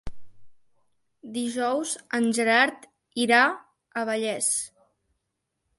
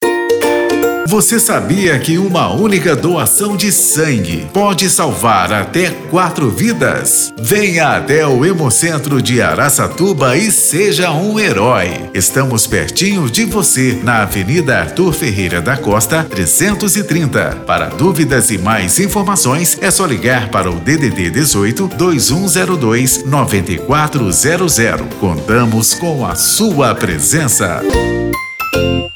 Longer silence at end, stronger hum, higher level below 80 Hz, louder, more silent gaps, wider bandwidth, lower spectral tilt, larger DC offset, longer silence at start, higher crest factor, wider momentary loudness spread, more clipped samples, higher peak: first, 1.1 s vs 0 s; neither; second, -56 dBFS vs -34 dBFS; second, -24 LUFS vs -11 LUFS; neither; second, 12 kHz vs over 20 kHz; second, -2 dB/octave vs -4 dB/octave; neither; about the same, 0.05 s vs 0 s; first, 20 dB vs 10 dB; first, 16 LU vs 4 LU; neither; second, -8 dBFS vs -2 dBFS